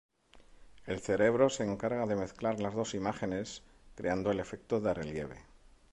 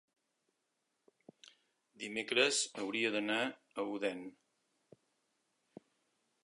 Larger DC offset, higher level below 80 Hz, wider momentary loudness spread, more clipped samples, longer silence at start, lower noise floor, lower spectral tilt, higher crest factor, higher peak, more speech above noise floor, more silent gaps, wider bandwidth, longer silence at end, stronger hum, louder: neither; first, -58 dBFS vs -88 dBFS; about the same, 13 LU vs 15 LU; neither; second, 0.35 s vs 1.45 s; second, -59 dBFS vs -84 dBFS; first, -5.5 dB/octave vs -1.5 dB/octave; second, 20 dB vs 26 dB; about the same, -14 dBFS vs -14 dBFS; second, 26 dB vs 48 dB; neither; about the same, 11 kHz vs 11.5 kHz; second, 0.5 s vs 2.1 s; neither; about the same, -34 LUFS vs -35 LUFS